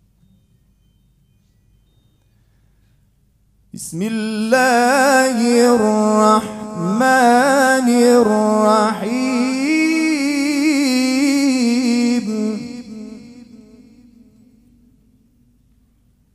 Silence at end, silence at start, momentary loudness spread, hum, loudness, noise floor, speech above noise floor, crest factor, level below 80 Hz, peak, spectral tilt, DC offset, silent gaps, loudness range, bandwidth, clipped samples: 2.95 s; 3.75 s; 12 LU; none; -15 LUFS; -58 dBFS; 42 dB; 16 dB; -58 dBFS; 0 dBFS; -4 dB/octave; under 0.1%; none; 11 LU; 14 kHz; under 0.1%